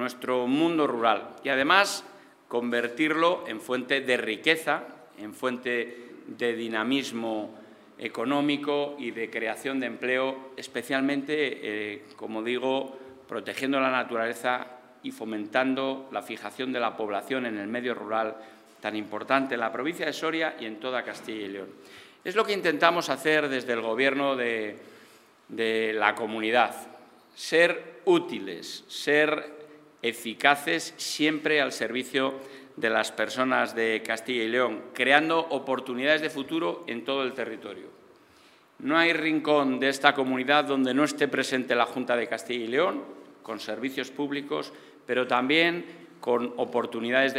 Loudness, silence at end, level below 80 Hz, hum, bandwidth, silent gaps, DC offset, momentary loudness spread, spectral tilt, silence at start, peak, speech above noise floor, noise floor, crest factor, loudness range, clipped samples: -27 LUFS; 0 s; -84 dBFS; none; 16 kHz; none; under 0.1%; 14 LU; -3.5 dB/octave; 0 s; -2 dBFS; 30 dB; -57 dBFS; 26 dB; 5 LU; under 0.1%